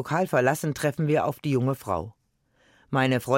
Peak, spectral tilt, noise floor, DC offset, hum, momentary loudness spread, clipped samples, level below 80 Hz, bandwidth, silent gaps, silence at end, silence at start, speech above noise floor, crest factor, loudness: -8 dBFS; -6 dB/octave; -66 dBFS; under 0.1%; none; 7 LU; under 0.1%; -60 dBFS; 17 kHz; none; 0 s; 0 s; 42 dB; 16 dB; -26 LUFS